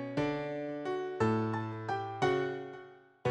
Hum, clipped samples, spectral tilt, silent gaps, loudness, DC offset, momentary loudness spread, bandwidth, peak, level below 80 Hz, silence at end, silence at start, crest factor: none; under 0.1%; -7 dB/octave; none; -34 LUFS; under 0.1%; 8 LU; 9.8 kHz; -18 dBFS; -64 dBFS; 0 s; 0 s; 16 dB